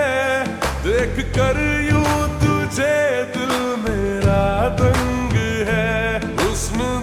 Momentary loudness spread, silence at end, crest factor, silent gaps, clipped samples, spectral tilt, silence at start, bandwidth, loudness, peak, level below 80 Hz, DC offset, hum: 4 LU; 0 s; 14 dB; none; under 0.1%; -5.5 dB/octave; 0 s; 19.5 kHz; -19 LUFS; -4 dBFS; -30 dBFS; under 0.1%; none